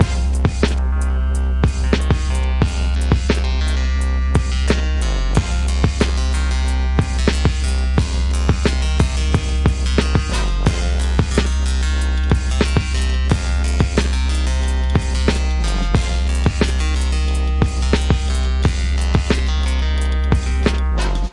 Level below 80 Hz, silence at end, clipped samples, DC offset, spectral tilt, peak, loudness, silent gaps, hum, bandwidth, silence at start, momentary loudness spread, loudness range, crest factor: -18 dBFS; 0 s; under 0.1%; 0.1%; -5.5 dB/octave; 0 dBFS; -19 LUFS; none; none; 11.5 kHz; 0 s; 2 LU; 1 LU; 16 dB